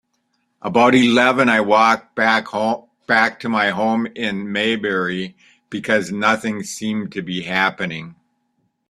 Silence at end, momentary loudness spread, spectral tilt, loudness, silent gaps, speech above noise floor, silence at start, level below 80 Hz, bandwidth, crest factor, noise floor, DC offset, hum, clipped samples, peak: 0.8 s; 13 LU; -4.5 dB/octave; -18 LUFS; none; 51 dB; 0.65 s; -60 dBFS; 13 kHz; 18 dB; -69 dBFS; under 0.1%; none; under 0.1%; 0 dBFS